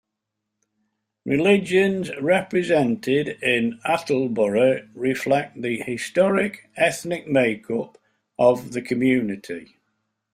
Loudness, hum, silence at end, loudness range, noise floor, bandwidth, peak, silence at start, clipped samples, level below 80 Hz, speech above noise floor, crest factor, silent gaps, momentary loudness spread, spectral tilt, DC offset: -22 LUFS; none; 0.7 s; 2 LU; -81 dBFS; 15.5 kHz; -4 dBFS; 1.25 s; under 0.1%; -62 dBFS; 60 dB; 18 dB; none; 10 LU; -5.5 dB/octave; under 0.1%